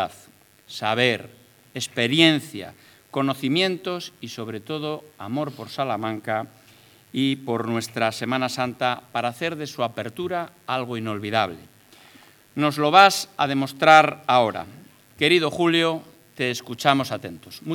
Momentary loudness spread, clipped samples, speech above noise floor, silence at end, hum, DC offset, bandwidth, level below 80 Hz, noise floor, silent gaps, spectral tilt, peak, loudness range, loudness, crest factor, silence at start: 17 LU; under 0.1%; 30 dB; 0 s; none; under 0.1%; 19.5 kHz; -72 dBFS; -53 dBFS; none; -4.5 dB/octave; 0 dBFS; 9 LU; -22 LUFS; 24 dB; 0 s